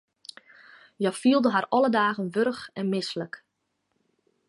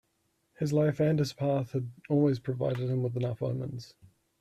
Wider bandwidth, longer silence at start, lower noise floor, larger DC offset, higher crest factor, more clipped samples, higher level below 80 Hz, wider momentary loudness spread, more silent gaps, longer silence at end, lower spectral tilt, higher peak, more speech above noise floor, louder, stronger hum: second, 11.5 kHz vs 13 kHz; first, 1 s vs 0.6 s; about the same, -77 dBFS vs -75 dBFS; neither; about the same, 18 dB vs 16 dB; neither; second, -76 dBFS vs -64 dBFS; first, 22 LU vs 9 LU; neither; first, 1.1 s vs 0.55 s; second, -5.5 dB/octave vs -8 dB/octave; first, -10 dBFS vs -14 dBFS; first, 53 dB vs 46 dB; first, -25 LUFS vs -30 LUFS; neither